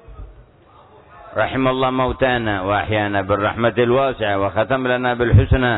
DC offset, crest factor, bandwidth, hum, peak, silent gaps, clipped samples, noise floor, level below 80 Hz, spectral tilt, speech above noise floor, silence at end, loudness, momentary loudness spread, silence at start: under 0.1%; 16 dB; 4.1 kHz; none; -2 dBFS; none; under 0.1%; -48 dBFS; -32 dBFS; -10.5 dB/octave; 31 dB; 0 s; -18 LUFS; 5 LU; 0.1 s